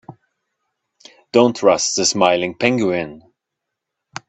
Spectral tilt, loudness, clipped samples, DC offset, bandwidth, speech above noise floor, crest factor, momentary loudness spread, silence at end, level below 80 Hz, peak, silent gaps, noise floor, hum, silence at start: -3.5 dB/octave; -16 LUFS; under 0.1%; under 0.1%; 8.6 kHz; 64 dB; 20 dB; 10 LU; 1.1 s; -60 dBFS; 0 dBFS; none; -80 dBFS; none; 0.1 s